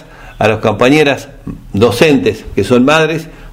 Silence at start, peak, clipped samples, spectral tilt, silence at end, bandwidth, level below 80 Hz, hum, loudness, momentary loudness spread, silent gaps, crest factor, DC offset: 0 s; 0 dBFS; 0.3%; -5.5 dB/octave; 0 s; 16.5 kHz; -36 dBFS; none; -11 LUFS; 13 LU; none; 12 dB; under 0.1%